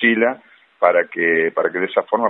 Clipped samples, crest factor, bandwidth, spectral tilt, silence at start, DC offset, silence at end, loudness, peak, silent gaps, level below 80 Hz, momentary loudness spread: under 0.1%; 18 dB; 4 kHz; -8 dB/octave; 0 s; under 0.1%; 0 s; -18 LUFS; 0 dBFS; none; -72 dBFS; 4 LU